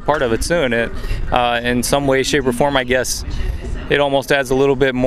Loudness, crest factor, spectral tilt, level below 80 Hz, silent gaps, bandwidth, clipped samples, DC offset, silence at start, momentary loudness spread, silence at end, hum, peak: -17 LUFS; 16 dB; -4 dB/octave; -28 dBFS; none; 15.5 kHz; under 0.1%; under 0.1%; 0 s; 9 LU; 0 s; none; 0 dBFS